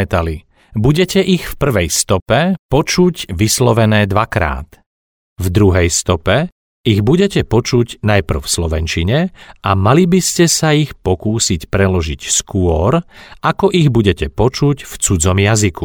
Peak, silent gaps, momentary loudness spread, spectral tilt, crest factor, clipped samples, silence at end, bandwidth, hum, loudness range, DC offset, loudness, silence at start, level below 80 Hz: 0 dBFS; 2.22-2.26 s, 2.59-2.69 s, 4.86-5.36 s, 6.52-6.84 s; 7 LU; -5 dB/octave; 14 dB; under 0.1%; 0 s; 20 kHz; none; 2 LU; under 0.1%; -14 LUFS; 0 s; -30 dBFS